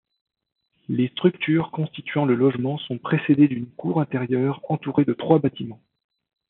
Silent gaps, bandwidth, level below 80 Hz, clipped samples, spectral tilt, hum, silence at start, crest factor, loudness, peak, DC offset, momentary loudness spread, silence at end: none; 4.1 kHz; -68 dBFS; under 0.1%; -6.5 dB/octave; none; 0.9 s; 20 dB; -22 LUFS; -4 dBFS; under 0.1%; 10 LU; 0.75 s